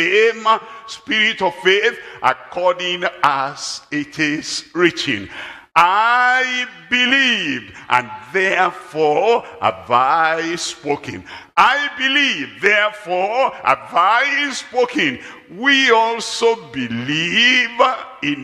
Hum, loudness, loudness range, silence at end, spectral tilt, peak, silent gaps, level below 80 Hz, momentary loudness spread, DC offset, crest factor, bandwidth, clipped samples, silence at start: none; -16 LUFS; 3 LU; 0 s; -3 dB/octave; 0 dBFS; none; -62 dBFS; 11 LU; under 0.1%; 18 dB; 13.5 kHz; under 0.1%; 0 s